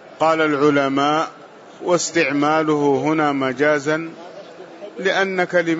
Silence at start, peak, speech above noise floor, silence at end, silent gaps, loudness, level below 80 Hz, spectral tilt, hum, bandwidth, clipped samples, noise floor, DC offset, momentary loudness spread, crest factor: 0.05 s; -4 dBFS; 20 dB; 0 s; none; -18 LUFS; -68 dBFS; -4.5 dB/octave; none; 8 kHz; under 0.1%; -38 dBFS; under 0.1%; 19 LU; 14 dB